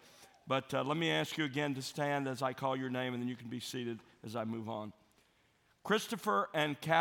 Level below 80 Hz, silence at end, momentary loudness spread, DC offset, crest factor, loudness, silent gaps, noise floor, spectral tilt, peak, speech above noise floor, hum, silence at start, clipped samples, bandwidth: -80 dBFS; 0 s; 11 LU; under 0.1%; 22 dB; -36 LUFS; none; -72 dBFS; -5 dB/octave; -16 dBFS; 36 dB; none; 0.05 s; under 0.1%; 17 kHz